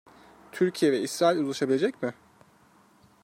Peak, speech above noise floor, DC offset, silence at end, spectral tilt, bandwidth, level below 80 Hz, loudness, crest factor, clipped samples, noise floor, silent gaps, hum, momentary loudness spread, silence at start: -10 dBFS; 34 dB; under 0.1%; 1.1 s; -5 dB/octave; 16 kHz; -74 dBFS; -26 LUFS; 18 dB; under 0.1%; -60 dBFS; none; none; 11 LU; 0.55 s